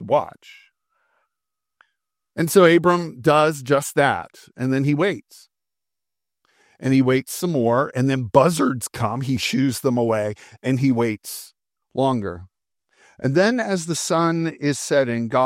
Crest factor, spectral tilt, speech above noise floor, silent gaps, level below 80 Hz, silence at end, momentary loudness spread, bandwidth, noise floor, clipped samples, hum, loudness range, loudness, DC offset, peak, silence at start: 20 dB; -5.5 dB/octave; 68 dB; none; -60 dBFS; 0 s; 12 LU; 16 kHz; -88 dBFS; under 0.1%; none; 5 LU; -20 LUFS; under 0.1%; 0 dBFS; 0 s